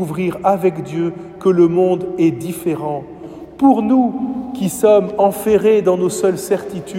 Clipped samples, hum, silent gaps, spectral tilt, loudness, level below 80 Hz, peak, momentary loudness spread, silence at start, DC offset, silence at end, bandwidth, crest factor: under 0.1%; none; none; -6.5 dB/octave; -16 LUFS; -52 dBFS; 0 dBFS; 10 LU; 0 s; under 0.1%; 0 s; 16.5 kHz; 16 dB